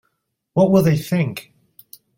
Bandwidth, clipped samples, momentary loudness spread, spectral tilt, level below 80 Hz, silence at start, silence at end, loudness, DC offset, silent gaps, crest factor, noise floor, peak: 17 kHz; under 0.1%; 11 LU; -7.5 dB/octave; -52 dBFS; 0.55 s; 0.75 s; -18 LUFS; under 0.1%; none; 18 dB; -73 dBFS; -2 dBFS